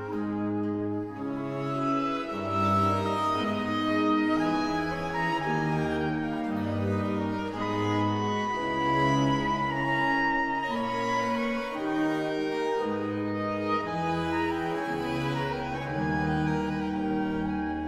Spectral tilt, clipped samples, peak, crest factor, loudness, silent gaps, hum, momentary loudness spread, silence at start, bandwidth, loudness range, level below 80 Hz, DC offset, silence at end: -6.5 dB/octave; under 0.1%; -14 dBFS; 14 dB; -28 LUFS; none; none; 6 LU; 0 s; 13.5 kHz; 3 LU; -52 dBFS; under 0.1%; 0 s